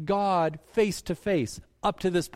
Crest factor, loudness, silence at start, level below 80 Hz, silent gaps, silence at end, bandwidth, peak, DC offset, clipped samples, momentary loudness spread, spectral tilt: 14 dB; -28 LUFS; 0 s; -52 dBFS; none; 0.05 s; 16 kHz; -12 dBFS; under 0.1%; under 0.1%; 6 LU; -5.5 dB/octave